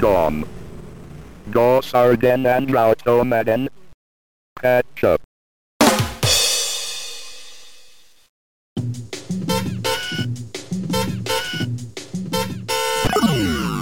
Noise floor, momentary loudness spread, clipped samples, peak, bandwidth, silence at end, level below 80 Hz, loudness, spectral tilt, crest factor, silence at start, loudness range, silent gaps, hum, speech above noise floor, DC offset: -50 dBFS; 17 LU; under 0.1%; -4 dBFS; 17 kHz; 0 s; -42 dBFS; -19 LUFS; -4 dB/octave; 16 dB; 0 s; 9 LU; 3.94-4.56 s, 5.24-5.80 s, 8.29-8.76 s; none; 33 dB; 1%